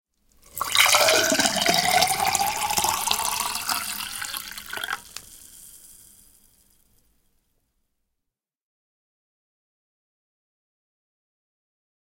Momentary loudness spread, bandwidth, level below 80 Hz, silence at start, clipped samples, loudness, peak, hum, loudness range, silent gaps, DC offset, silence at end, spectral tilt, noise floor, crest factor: 16 LU; 17 kHz; -58 dBFS; 0.55 s; under 0.1%; -21 LUFS; -2 dBFS; none; 18 LU; none; under 0.1%; 6.1 s; -0.5 dB/octave; -83 dBFS; 26 dB